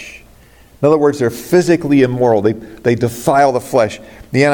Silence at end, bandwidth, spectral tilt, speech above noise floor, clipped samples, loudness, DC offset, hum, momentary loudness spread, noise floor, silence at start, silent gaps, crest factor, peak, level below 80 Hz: 0 s; 17.5 kHz; -6.5 dB/octave; 31 dB; under 0.1%; -14 LUFS; under 0.1%; none; 7 LU; -44 dBFS; 0 s; none; 14 dB; 0 dBFS; -48 dBFS